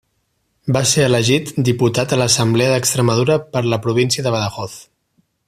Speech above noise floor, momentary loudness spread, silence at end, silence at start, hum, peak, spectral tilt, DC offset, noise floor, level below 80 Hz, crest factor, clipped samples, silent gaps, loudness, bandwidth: 51 dB; 7 LU; 0.65 s; 0.65 s; none; 0 dBFS; -4.5 dB/octave; under 0.1%; -67 dBFS; -50 dBFS; 16 dB; under 0.1%; none; -16 LUFS; 15 kHz